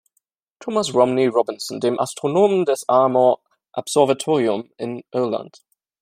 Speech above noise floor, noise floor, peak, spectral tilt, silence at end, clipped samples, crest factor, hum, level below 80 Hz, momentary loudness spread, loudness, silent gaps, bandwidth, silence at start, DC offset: 52 dB; -71 dBFS; -2 dBFS; -5 dB/octave; 0.55 s; under 0.1%; 18 dB; none; -68 dBFS; 12 LU; -20 LUFS; none; 16 kHz; 0.6 s; under 0.1%